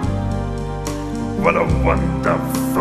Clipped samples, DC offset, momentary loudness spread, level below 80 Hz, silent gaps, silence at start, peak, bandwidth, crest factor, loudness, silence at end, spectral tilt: under 0.1%; under 0.1%; 8 LU; -28 dBFS; none; 0 s; -2 dBFS; 14 kHz; 18 dB; -20 LUFS; 0 s; -6.5 dB/octave